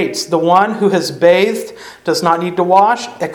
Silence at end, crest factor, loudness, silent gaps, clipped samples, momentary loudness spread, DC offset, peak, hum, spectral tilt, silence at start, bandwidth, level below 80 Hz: 0 s; 14 dB; -13 LUFS; none; under 0.1%; 8 LU; under 0.1%; 0 dBFS; none; -4.5 dB/octave; 0 s; 18 kHz; -58 dBFS